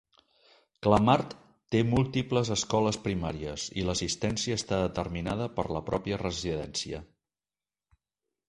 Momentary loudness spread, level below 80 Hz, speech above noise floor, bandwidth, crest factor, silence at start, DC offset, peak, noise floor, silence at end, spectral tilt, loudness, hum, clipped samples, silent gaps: 9 LU; -50 dBFS; over 61 dB; 11.5 kHz; 24 dB; 0.8 s; under 0.1%; -6 dBFS; under -90 dBFS; 1.45 s; -5 dB/octave; -29 LUFS; none; under 0.1%; none